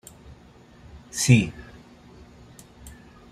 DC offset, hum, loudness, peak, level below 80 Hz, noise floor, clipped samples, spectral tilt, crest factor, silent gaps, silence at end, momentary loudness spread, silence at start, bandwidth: under 0.1%; none; -22 LUFS; -4 dBFS; -52 dBFS; -51 dBFS; under 0.1%; -5 dB/octave; 24 dB; none; 0.45 s; 28 LU; 0.95 s; 15 kHz